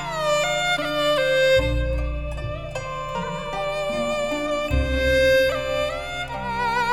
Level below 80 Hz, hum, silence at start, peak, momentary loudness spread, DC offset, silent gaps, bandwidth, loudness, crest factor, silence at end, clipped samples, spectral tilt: -32 dBFS; none; 0 s; -10 dBFS; 11 LU; under 0.1%; none; 16.5 kHz; -23 LUFS; 14 dB; 0 s; under 0.1%; -4.5 dB/octave